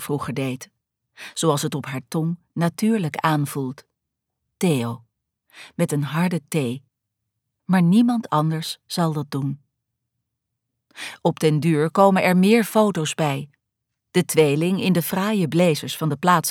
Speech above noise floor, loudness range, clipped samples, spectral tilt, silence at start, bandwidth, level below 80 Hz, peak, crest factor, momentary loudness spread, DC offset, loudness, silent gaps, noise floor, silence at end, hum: 60 dB; 6 LU; under 0.1%; -6 dB/octave; 0 s; 17.5 kHz; -68 dBFS; -4 dBFS; 18 dB; 14 LU; under 0.1%; -21 LUFS; none; -81 dBFS; 0 s; none